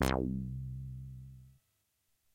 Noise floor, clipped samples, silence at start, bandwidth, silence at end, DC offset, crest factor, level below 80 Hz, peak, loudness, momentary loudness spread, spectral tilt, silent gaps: -79 dBFS; under 0.1%; 0 s; 16 kHz; 0.85 s; under 0.1%; 28 dB; -48 dBFS; -12 dBFS; -39 LUFS; 19 LU; -6 dB/octave; none